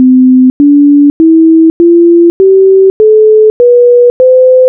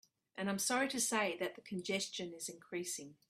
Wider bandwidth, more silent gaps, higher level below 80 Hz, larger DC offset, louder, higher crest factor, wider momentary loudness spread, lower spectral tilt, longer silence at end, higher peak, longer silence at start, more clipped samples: second, 1.9 kHz vs 15.5 kHz; first, 0.50-0.60 s, 1.10-1.20 s, 1.70-1.80 s, 2.30-2.40 s, 2.90-3.00 s, 3.50-3.60 s, 4.10-4.20 s vs none; first, -42 dBFS vs -82 dBFS; neither; first, -5 LUFS vs -38 LUFS; second, 4 dB vs 20 dB; second, 1 LU vs 10 LU; first, -10.5 dB/octave vs -2.5 dB/octave; second, 0 s vs 0.15 s; first, 0 dBFS vs -20 dBFS; second, 0 s vs 0.35 s; neither